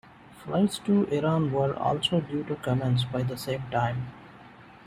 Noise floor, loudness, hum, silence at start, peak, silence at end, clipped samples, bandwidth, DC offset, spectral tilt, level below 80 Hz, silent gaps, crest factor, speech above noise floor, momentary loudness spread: -50 dBFS; -27 LUFS; none; 0.25 s; -12 dBFS; 0.1 s; under 0.1%; 15 kHz; under 0.1%; -6.5 dB/octave; -58 dBFS; none; 16 dB; 23 dB; 8 LU